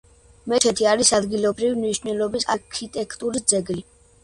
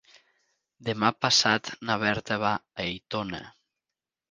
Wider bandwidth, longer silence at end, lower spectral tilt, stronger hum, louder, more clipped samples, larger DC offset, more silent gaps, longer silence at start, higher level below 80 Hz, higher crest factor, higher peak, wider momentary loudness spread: about the same, 11.5 kHz vs 10.5 kHz; second, 0.4 s vs 0.8 s; about the same, -2.5 dB/octave vs -3 dB/octave; neither; first, -21 LUFS vs -26 LUFS; neither; neither; neither; second, 0.45 s vs 0.8 s; first, -52 dBFS vs -60 dBFS; about the same, 20 dB vs 24 dB; first, -2 dBFS vs -6 dBFS; about the same, 13 LU vs 13 LU